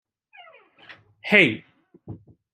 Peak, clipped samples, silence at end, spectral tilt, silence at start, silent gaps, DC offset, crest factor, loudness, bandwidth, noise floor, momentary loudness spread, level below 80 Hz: 0 dBFS; under 0.1%; 0.4 s; -5.5 dB/octave; 0.9 s; none; under 0.1%; 26 dB; -18 LUFS; 13.5 kHz; -52 dBFS; 27 LU; -68 dBFS